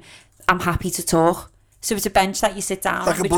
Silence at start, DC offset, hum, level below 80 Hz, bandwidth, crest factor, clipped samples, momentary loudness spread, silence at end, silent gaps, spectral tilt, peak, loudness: 0.1 s; under 0.1%; none; -42 dBFS; over 20 kHz; 22 dB; under 0.1%; 6 LU; 0 s; none; -4 dB/octave; 0 dBFS; -21 LUFS